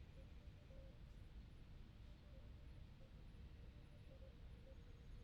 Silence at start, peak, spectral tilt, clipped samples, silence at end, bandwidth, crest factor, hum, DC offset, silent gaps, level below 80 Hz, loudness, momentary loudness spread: 0 s; -48 dBFS; -7 dB/octave; under 0.1%; 0 s; 10.5 kHz; 12 dB; none; under 0.1%; none; -62 dBFS; -63 LUFS; 2 LU